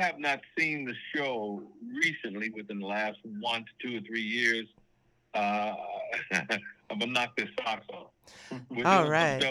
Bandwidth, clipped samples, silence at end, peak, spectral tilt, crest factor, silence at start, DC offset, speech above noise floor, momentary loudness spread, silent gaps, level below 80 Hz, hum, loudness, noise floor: 13.5 kHz; under 0.1%; 0 s; -10 dBFS; -4 dB/octave; 22 dB; 0 s; under 0.1%; 37 dB; 13 LU; none; -74 dBFS; none; -31 LUFS; -69 dBFS